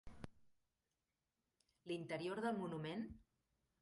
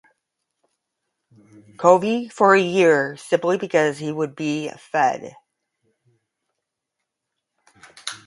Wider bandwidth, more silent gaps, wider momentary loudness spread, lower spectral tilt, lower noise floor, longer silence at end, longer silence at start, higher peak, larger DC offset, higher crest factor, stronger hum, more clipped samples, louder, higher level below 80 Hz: about the same, 11.5 kHz vs 11.5 kHz; neither; first, 17 LU vs 13 LU; first, -6.5 dB/octave vs -5 dB/octave; first, under -90 dBFS vs -81 dBFS; first, 0.6 s vs 0.1 s; second, 0.05 s vs 1.8 s; second, -30 dBFS vs 0 dBFS; neither; about the same, 20 dB vs 22 dB; neither; neither; second, -46 LUFS vs -19 LUFS; about the same, -72 dBFS vs -70 dBFS